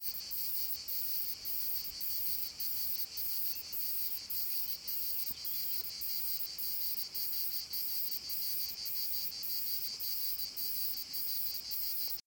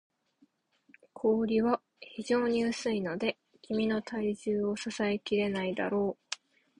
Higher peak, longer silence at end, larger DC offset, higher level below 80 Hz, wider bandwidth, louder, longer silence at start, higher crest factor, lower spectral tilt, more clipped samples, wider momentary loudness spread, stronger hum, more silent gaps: second, -20 dBFS vs -12 dBFS; second, 0.05 s vs 0.45 s; neither; about the same, -70 dBFS vs -66 dBFS; first, 17 kHz vs 11 kHz; about the same, -34 LUFS vs -32 LUFS; second, 0 s vs 1.15 s; about the same, 16 dB vs 20 dB; second, 0.5 dB/octave vs -5.5 dB/octave; neither; second, 2 LU vs 11 LU; neither; neither